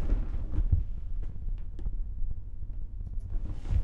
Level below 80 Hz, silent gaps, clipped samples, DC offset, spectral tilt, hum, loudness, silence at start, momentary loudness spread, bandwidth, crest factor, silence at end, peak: -32 dBFS; none; under 0.1%; under 0.1%; -9.5 dB/octave; none; -37 LUFS; 0 s; 11 LU; 3.2 kHz; 16 dB; 0 s; -12 dBFS